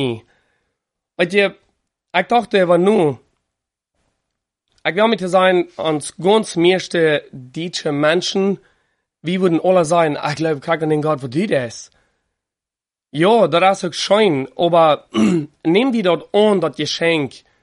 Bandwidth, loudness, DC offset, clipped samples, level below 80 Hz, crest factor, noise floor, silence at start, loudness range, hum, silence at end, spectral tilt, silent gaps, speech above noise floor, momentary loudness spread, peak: 11.5 kHz; -16 LUFS; under 0.1%; under 0.1%; -62 dBFS; 16 dB; -89 dBFS; 0 s; 4 LU; none; 0.25 s; -5 dB/octave; none; 73 dB; 9 LU; -2 dBFS